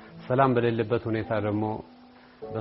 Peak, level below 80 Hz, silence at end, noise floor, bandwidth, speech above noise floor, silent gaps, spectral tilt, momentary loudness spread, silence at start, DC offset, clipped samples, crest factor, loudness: -6 dBFS; -58 dBFS; 0 s; -46 dBFS; 5.8 kHz; 21 dB; none; -6.5 dB/octave; 14 LU; 0 s; under 0.1%; under 0.1%; 20 dB; -26 LUFS